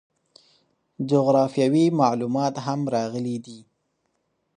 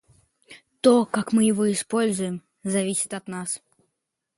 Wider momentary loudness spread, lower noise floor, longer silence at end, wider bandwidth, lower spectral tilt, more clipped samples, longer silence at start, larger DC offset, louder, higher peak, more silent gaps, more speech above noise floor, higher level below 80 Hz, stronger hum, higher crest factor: about the same, 11 LU vs 12 LU; second, -73 dBFS vs -80 dBFS; first, 0.95 s vs 0.8 s; second, 10 kHz vs 11.5 kHz; first, -7 dB/octave vs -4.5 dB/octave; neither; first, 1 s vs 0.5 s; neither; about the same, -22 LUFS vs -23 LUFS; about the same, -6 dBFS vs -4 dBFS; neither; second, 52 dB vs 58 dB; about the same, -72 dBFS vs -68 dBFS; neither; about the same, 18 dB vs 20 dB